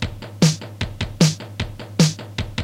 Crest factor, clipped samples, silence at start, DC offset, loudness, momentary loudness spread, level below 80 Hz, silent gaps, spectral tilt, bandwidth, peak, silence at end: 18 dB; under 0.1%; 0 s; under 0.1%; -21 LUFS; 11 LU; -38 dBFS; none; -5 dB/octave; 15.5 kHz; -2 dBFS; 0 s